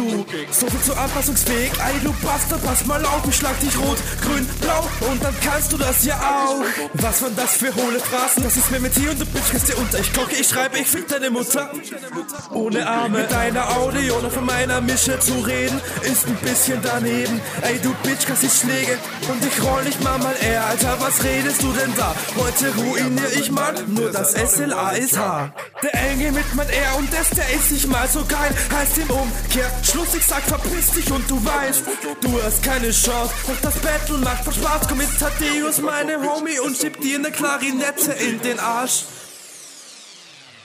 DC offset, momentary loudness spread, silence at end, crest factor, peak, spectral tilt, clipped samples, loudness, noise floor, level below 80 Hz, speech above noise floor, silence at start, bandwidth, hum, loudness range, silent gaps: under 0.1%; 5 LU; 0 s; 16 dB; -4 dBFS; -3 dB/octave; under 0.1%; -19 LUFS; -43 dBFS; -30 dBFS; 24 dB; 0 s; 16 kHz; none; 2 LU; none